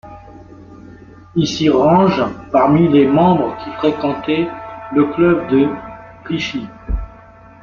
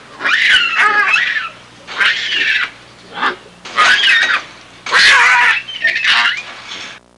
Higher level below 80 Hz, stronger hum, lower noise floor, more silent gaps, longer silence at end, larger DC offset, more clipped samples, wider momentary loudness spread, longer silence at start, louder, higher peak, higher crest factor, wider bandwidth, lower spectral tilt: first, -34 dBFS vs -54 dBFS; second, none vs 60 Hz at -50 dBFS; first, -41 dBFS vs -35 dBFS; neither; first, 0.55 s vs 0.2 s; neither; neither; second, 15 LU vs 19 LU; about the same, 0.05 s vs 0.1 s; second, -15 LUFS vs -11 LUFS; about the same, -2 dBFS vs 0 dBFS; about the same, 14 dB vs 14 dB; second, 7.2 kHz vs 11.5 kHz; first, -7 dB/octave vs 0.5 dB/octave